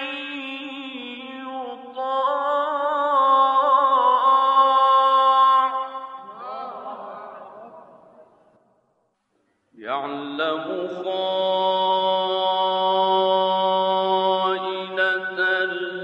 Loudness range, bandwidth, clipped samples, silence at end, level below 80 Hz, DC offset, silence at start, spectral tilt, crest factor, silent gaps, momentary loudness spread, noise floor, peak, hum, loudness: 19 LU; 7.6 kHz; under 0.1%; 0 s; -82 dBFS; under 0.1%; 0 s; -5 dB/octave; 16 dB; none; 18 LU; -69 dBFS; -6 dBFS; none; -20 LUFS